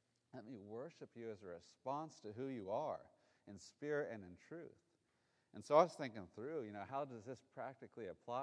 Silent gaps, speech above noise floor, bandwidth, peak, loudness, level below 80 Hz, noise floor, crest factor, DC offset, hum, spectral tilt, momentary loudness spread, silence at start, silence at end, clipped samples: none; 37 dB; 10 kHz; -18 dBFS; -45 LUFS; -88 dBFS; -82 dBFS; 28 dB; under 0.1%; none; -6 dB/octave; 19 LU; 0.35 s; 0 s; under 0.1%